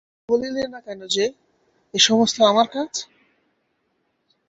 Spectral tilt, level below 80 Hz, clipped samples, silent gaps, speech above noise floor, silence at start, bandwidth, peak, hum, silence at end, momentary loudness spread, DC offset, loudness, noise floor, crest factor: -2.5 dB/octave; -64 dBFS; under 0.1%; none; 50 dB; 0.3 s; 8.2 kHz; -2 dBFS; none; 1.45 s; 15 LU; under 0.1%; -20 LUFS; -70 dBFS; 20 dB